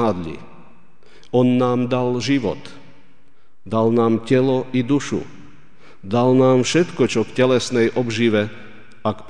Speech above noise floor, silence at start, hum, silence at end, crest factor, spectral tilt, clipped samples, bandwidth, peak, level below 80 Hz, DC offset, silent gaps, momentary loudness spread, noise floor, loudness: 42 dB; 0 s; none; 0.1 s; 16 dB; -6 dB/octave; under 0.1%; 10 kHz; -4 dBFS; -56 dBFS; 2%; none; 12 LU; -60 dBFS; -19 LUFS